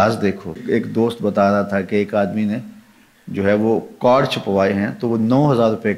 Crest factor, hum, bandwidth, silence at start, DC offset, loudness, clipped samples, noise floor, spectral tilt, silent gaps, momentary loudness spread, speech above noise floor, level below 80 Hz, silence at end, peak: 14 dB; none; 13 kHz; 0 s; under 0.1%; -18 LUFS; under 0.1%; -48 dBFS; -7.5 dB/octave; none; 7 LU; 31 dB; -56 dBFS; 0 s; -4 dBFS